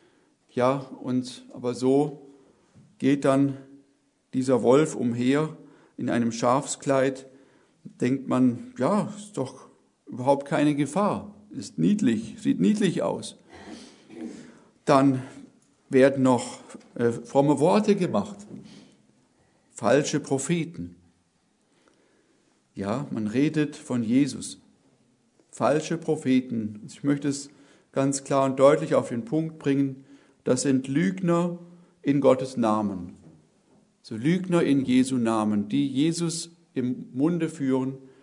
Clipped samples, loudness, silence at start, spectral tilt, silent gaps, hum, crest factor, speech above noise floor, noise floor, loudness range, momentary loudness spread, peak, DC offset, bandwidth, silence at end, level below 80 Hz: under 0.1%; -25 LUFS; 0.55 s; -6 dB/octave; none; none; 22 dB; 44 dB; -68 dBFS; 4 LU; 18 LU; -4 dBFS; under 0.1%; 11 kHz; 0.15 s; -70 dBFS